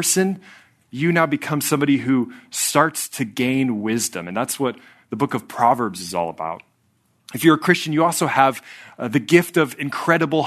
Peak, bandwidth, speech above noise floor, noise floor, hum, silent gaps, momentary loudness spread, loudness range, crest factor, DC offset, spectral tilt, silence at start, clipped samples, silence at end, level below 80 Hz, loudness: 0 dBFS; 14 kHz; 44 dB; -64 dBFS; none; none; 12 LU; 4 LU; 20 dB; under 0.1%; -4.5 dB/octave; 0 s; under 0.1%; 0 s; -66 dBFS; -20 LUFS